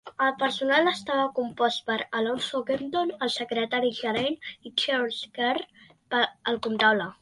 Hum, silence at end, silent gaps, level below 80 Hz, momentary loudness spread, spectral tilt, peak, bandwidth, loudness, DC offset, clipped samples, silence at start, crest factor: none; 0.1 s; none; -68 dBFS; 7 LU; -3.5 dB/octave; -8 dBFS; 11.5 kHz; -26 LUFS; under 0.1%; under 0.1%; 0.05 s; 20 dB